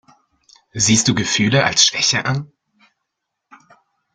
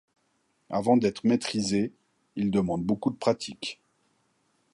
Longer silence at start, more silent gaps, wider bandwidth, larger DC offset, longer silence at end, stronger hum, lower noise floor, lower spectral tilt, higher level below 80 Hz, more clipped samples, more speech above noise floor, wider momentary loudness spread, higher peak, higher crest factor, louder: about the same, 0.75 s vs 0.7 s; neither; about the same, 11 kHz vs 11.5 kHz; neither; first, 1.7 s vs 1 s; neither; first, -78 dBFS vs -72 dBFS; second, -2.5 dB/octave vs -5.5 dB/octave; first, -52 dBFS vs -60 dBFS; neither; first, 61 dB vs 46 dB; about the same, 11 LU vs 13 LU; first, 0 dBFS vs -8 dBFS; about the same, 20 dB vs 20 dB; first, -15 LUFS vs -27 LUFS